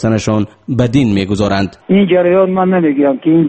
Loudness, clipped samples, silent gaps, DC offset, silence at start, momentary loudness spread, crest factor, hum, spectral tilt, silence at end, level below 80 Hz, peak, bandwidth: -12 LUFS; under 0.1%; none; under 0.1%; 0 s; 6 LU; 12 dB; none; -7 dB/octave; 0 s; -40 dBFS; 0 dBFS; 8.8 kHz